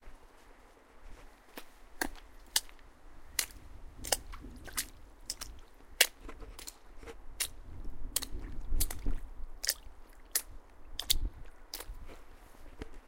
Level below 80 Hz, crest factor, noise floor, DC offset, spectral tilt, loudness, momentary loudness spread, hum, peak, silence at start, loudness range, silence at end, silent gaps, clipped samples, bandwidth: -44 dBFS; 32 dB; -58 dBFS; under 0.1%; -1 dB/octave; -36 LUFS; 23 LU; none; -6 dBFS; 0 s; 4 LU; 0 s; none; under 0.1%; 17 kHz